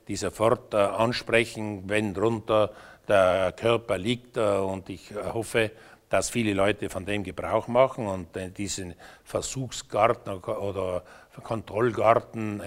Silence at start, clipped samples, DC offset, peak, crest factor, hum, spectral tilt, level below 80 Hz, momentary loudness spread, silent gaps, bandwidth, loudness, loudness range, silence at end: 0.1 s; under 0.1%; under 0.1%; -4 dBFS; 22 dB; none; -5 dB/octave; -54 dBFS; 11 LU; none; 16 kHz; -27 LUFS; 5 LU; 0 s